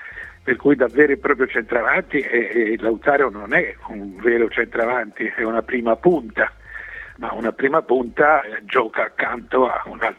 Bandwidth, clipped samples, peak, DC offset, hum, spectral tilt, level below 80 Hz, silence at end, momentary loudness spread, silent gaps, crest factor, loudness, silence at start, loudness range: 4.9 kHz; under 0.1%; 0 dBFS; under 0.1%; none; -7.5 dB/octave; -50 dBFS; 0.05 s; 12 LU; none; 18 dB; -19 LUFS; 0 s; 3 LU